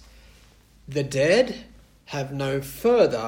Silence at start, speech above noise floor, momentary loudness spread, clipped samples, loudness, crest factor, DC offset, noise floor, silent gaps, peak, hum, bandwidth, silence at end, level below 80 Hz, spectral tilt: 0.9 s; 31 dB; 13 LU; under 0.1%; -24 LUFS; 18 dB; under 0.1%; -54 dBFS; none; -6 dBFS; none; 16.5 kHz; 0 s; -52 dBFS; -5.5 dB/octave